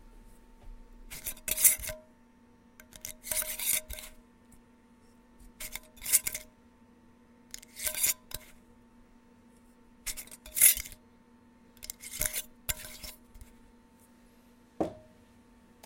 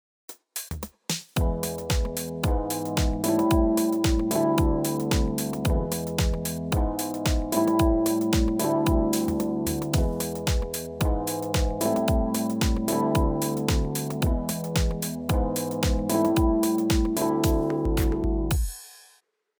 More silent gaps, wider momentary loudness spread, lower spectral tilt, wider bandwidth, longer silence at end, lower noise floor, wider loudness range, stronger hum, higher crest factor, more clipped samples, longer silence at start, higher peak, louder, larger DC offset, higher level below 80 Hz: neither; first, 22 LU vs 6 LU; second, 0 dB/octave vs -5.5 dB/octave; second, 17 kHz vs over 20 kHz; first, 0.85 s vs 0.6 s; about the same, -60 dBFS vs -63 dBFS; first, 10 LU vs 2 LU; neither; first, 32 dB vs 16 dB; neither; second, 0.05 s vs 0.3 s; first, -4 dBFS vs -8 dBFS; second, -29 LUFS vs -25 LUFS; neither; second, -54 dBFS vs -30 dBFS